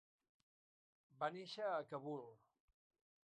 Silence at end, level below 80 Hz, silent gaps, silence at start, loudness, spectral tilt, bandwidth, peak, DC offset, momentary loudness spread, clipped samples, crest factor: 0.9 s; under -90 dBFS; none; 1.15 s; -47 LUFS; -5.5 dB/octave; 9.4 kHz; -28 dBFS; under 0.1%; 8 LU; under 0.1%; 22 dB